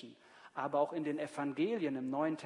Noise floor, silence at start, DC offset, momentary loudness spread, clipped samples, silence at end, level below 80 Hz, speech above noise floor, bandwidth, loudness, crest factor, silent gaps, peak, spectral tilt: -58 dBFS; 0 s; under 0.1%; 8 LU; under 0.1%; 0 s; -90 dBFS; 22 dB; 11 kHz; -37 LUFS; 16 dB; none; -20 dBFS; -6.5 dB/octave